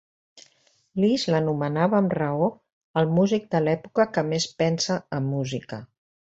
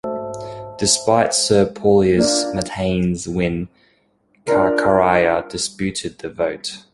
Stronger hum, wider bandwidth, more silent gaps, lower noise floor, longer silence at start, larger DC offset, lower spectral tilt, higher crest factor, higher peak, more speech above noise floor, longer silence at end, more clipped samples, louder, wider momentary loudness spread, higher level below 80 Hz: neither; second, 8 kHz vs 11.5 kHz; first, 2.72-2.94 s vs none; about the same, -63 dBFS vs -60 dBFS; first, 0.35 s vs 0.05 s; neither; first, -6 dB/octave vs -4 dB/octave; about the same, 18 dB vs 16 dB; second, -6 dBFS vs -2 dBFS; about the same, 40 dB vs 42 dB; first, 0.55 s vs 0.15 s; neither; second, -24 LUFS vs -18 LUFS; second, 9 LU vs 14 LU; second, -64 dBFS vs -44 dBFS